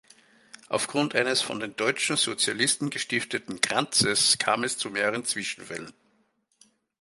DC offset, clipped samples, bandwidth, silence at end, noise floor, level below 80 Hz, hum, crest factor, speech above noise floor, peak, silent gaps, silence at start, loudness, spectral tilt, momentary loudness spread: under 0.1%; under 0.1%; 12 kHz; 1.1 s; -70 dBFS; -68 dBFS; none; 26 dB; 43 dB; -2 dBFS; none; 0.7 s; -25 LUFS; -2 dB/octave; 11 LU